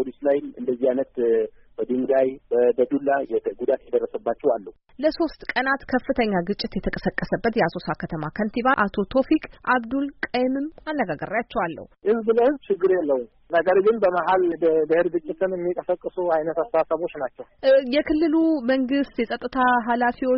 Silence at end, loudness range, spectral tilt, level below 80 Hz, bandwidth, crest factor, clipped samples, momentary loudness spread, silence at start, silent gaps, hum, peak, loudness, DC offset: 0 s; 3 LU; -4 dB/octave; -50 dBFS; 5.8 kHz; 16 dB; under 0.1%; 8 LU; 0 s; none; none; -8 dBFS; -23 LUFS; under 0.1%